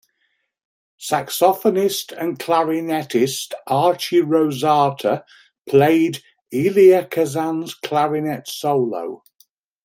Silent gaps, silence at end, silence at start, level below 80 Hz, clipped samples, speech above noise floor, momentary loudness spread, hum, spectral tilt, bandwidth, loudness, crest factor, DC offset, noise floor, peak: 5.61-5.65 s; 0.7 s; 1 s; -66 dBFS; under 0.1%; 51 dB; 12 LU; none; -5 dB/octave; 16.5 kHz; -19 LUFS; 18 dB; under 0.1%; -69 dBFS; -2 dBFS